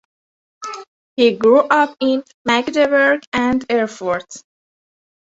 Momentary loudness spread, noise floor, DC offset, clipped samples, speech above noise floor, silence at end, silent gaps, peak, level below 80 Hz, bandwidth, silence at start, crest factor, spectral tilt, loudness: 18 LU; under -90 dBFS; under 0.1%; under 0.1%; over 74 dB; 0.85 s; 0.87-1.16 s, 2.34-2.45 s, 3.27-3.32 s; -2 dBFS; -56 dBFS; 8 kHz; 0.6 s; 16 dB; -4 dB/octave; -16 LUFS